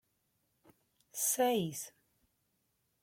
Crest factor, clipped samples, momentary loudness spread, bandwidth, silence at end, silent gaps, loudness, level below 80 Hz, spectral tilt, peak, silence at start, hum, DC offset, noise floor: 20 dB; under 0.1%; 16 LU; 16.5 kHz; 1.15 s; none; -33 LUFS; -80 dBFS; -3 dB/octave; -20 dBFS; 1.15 s; none; under 0.1%; -80 dBFS